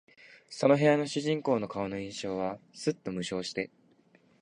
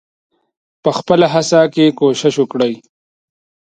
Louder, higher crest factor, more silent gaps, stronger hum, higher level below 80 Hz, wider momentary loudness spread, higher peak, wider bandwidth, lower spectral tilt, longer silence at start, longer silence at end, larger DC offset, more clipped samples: second, -30 LUFS vs -14 LUFS; first, 22 dB vs 16 dB; neither; neither; second, -66 dBFS vs -58 dBFS; first, 12 LU vs 7 LU; second, -10 dBFS vs 0 dBFS; about the same, 10.5 kHz vs 9.6 kHz; about the same, -5.5 dB/octave vs -5 dB/octave; second, 0.2 s vs 0.85 s; second, 0.75 s vs 1 s; neither; neither